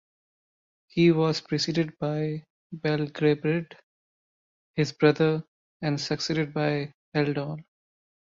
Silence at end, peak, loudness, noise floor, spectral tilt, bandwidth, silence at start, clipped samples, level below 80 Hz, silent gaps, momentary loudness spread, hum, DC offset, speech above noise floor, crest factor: 0.7 s; -6 dBFS; -27 LUFS; under -90 dBFS; -6 dB/octave; 7.6 kHz; 0.95 s; under 0.1%; -64 dBFS; 2.50-2.70 s, 3.83-4.74 s, 5.48-5.80 s, 6.94-7.12 s; 12 LU; none; under 0.1%; over 65 dB; 22 dB